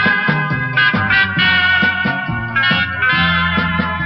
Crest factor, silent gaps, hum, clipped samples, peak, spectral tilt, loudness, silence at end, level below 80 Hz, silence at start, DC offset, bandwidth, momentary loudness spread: 14 dB; none; none; under 0.1%; -2 dBFS; -2 dB/octave; -14 LUFS; 0 s; -38 dBFS; 0 s; under 0.1%; 6 kHz; 6 LU